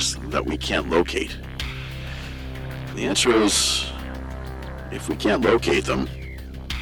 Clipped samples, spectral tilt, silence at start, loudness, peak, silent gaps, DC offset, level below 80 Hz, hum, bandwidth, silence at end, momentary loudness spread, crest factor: under 0.1%; -3.5 dB/octave; 0 s; -23 LUFS; -4 dBFS; none; under 0.1%; -36 dBFS; none; 19 kHz; 0 s; 16 LU; 20 dB